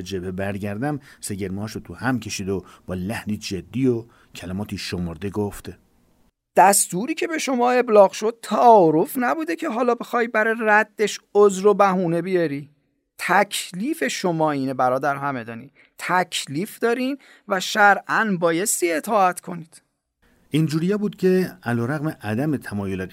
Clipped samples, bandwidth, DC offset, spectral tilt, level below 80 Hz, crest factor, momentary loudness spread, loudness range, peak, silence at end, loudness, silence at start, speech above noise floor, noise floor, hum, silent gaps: under 0.1%; 16 kHz; under 0.1%; -4.5 dB/octave; -60 dBFS; 20 dB; 14 LU; 9 LU; -2 dBFS; 0.05 s; -21 LUFS; 0 s; 43 dB; -64 dBFS; none; none